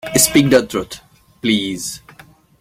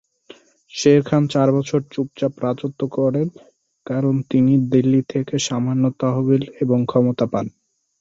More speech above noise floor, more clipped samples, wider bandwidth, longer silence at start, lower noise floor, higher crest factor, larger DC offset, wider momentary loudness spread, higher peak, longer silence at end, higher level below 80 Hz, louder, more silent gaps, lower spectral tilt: about the same, 30 dB vs 29 dB; neither; first, 16.5 kHz vs 7.8 kHz; second, 0.05 s vs 0.75 s; about the same, -46 dBFS vs -47 dBFS; about the same, 18 dB vs 16 dB; neither; first, 20 LU vs 9 LU; about the same, 0 dBFS vs -2 dBFS; about the same, 0.6 s vs 0.5 s; first, -46 dBFS vs -58 dBFS; first, -16 LUFS vs -19 LUFS; neither; second, -3.5 dB/octave vs -7 dB/octave